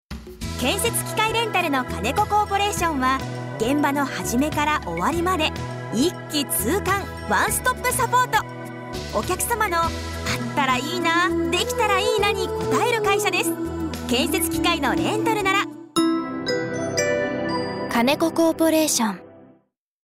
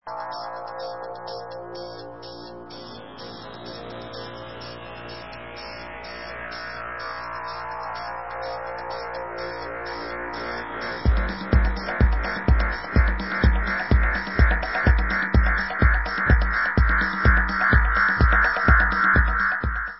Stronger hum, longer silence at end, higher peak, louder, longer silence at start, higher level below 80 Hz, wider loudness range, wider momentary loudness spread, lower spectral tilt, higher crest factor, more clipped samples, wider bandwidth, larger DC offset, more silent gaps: neither; first, 0.6 s vs 0 s; second, -8 dBFS vs -4 dBFS; about the same, -22 LUFS vs -23 LUFS; about the same, 0.1 s vs 0.05 s; second, -44 dBFS vs -26 dBFS; second, 2 LU vs 17 LU; second, 7 LU vs 18 LU; second, -3.5 dB/octave vs -10 dB/octave; second, 14 dB vs 20 dB; neither; first, 16 kHz vs 5.8 kHz; second, under 0.1% vs 0.3%; neither